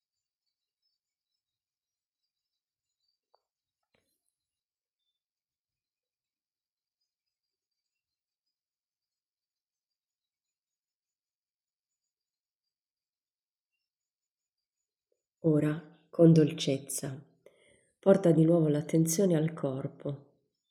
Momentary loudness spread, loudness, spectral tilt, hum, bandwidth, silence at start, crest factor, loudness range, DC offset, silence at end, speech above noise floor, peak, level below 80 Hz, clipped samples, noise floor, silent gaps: 18 LU; -27 LUFS; -6.5 dB/octave; none; 14 kHz; 15.45 s; 24 dB; 9 LU; under 0.1%; 0.55 s; over 64 dB; -10 dBFS; -76 dBFS; under 0.1%; under -90 dBFS; none